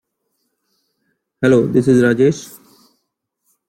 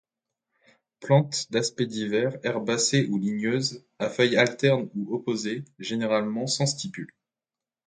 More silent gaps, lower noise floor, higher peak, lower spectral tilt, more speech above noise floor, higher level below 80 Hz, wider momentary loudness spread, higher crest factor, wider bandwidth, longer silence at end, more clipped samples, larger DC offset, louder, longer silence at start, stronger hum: neither; second, -73 dBFS vs under -90 dBFS; first, -2 dBFS vs -8 dBFS; first, -7 dB/octave vs -4.5 dB/octave; second, 60 dB vs over 64 dB; first, -54 dBFS vs -70 dBFS; about the same, 13 LU vs 11 LU; about the same, 16 dB vs 20 dB; first, 16 kHz vs 9.6 kHz; first, 1.25 s vs 0.8 s; neither; neither; first, -14 LUFS vs -26 LUFS; first, 1.4 s vs 1 s; neither